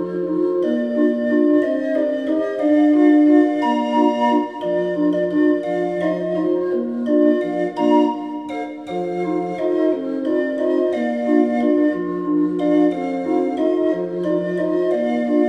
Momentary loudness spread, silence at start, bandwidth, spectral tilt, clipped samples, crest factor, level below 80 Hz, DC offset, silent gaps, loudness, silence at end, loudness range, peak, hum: 7 LU; 0 s; 6 kHz; -7.5 dB/octave; under 0.1%; 14 dB; -68 dBFS; under 0.1%; none; -19 LUFS; 0 s; 4 LU; -4 dBFS; none